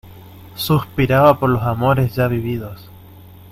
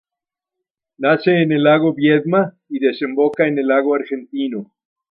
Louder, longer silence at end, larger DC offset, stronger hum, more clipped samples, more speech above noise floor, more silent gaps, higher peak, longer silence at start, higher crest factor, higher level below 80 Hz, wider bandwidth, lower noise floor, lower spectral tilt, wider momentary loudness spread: about the same, -17 LUFS vs -17 LUFS; second, 0.3 s vs 0.45 s; neither; neither; neither; second, 24 dB vs 70 dB; neither; about the same, 0 dBFS vs 0 dBFS; second, 0.05 s vs 1 s; about the same, 18 dB vs 16 dB; first, -42 dBFS vs -68 dBFS; first, 16.5 kHz vs 5.4 kHz; second, -41 dBFS vs -86 dBFS; second, -7 dB/octave vs -9.5 dB/octave; first, 14 LU vs 10 LU